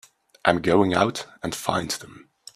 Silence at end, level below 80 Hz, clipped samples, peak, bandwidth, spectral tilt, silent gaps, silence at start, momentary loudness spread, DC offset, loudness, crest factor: 0.35 s; -56 dBFS; under 0.1%; 0 dBFS; 15.5 kHz; -4.5 dB/octave; none; 0.45 s; 12 LU; under 0.1%; -23 LUFS; 24 dB